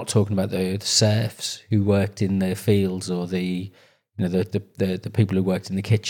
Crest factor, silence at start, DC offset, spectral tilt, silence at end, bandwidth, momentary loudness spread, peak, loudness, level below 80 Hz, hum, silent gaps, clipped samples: 16 dB; 0 s; under 0.1%; -5.5 dB/octave; 0 s; 17 kHz; 9 LU; -6 dBFS; -23 LUFS; -64 dBFS; none; none; under 0.1%